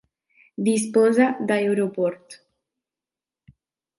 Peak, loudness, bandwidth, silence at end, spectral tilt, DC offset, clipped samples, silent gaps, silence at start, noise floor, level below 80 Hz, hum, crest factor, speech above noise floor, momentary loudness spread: -6 dBFS; -21 LUFS; 11.5 kHz; 1.65 s; -5.5 dB/octave; under 0.1%; under 0.1%; none; 0.6 s; under -90 dBFS; -72 dBFS; none; 18 dB; over 69 dB; 10 LU